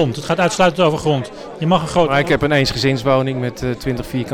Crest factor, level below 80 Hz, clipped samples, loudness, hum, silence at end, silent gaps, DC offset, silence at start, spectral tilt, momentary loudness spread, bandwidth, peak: 14 dB; -40 dBFS; under 0.1%; -17 LUFS; none; 0 s; none; under 0.1%; 0 s; -5.5 dB/octave; 8 LU; 16.5 kHz; -4 dBFS